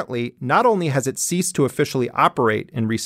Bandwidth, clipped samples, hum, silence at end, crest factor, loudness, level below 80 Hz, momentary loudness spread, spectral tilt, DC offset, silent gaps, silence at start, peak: 16 kHz; under 0.1%; none; 0 s; 18 dB; -20 LUFS; -60 dBFS; 7 LU; -5 dB/octave; under 0.1%; none; 0 s; -2 dBFS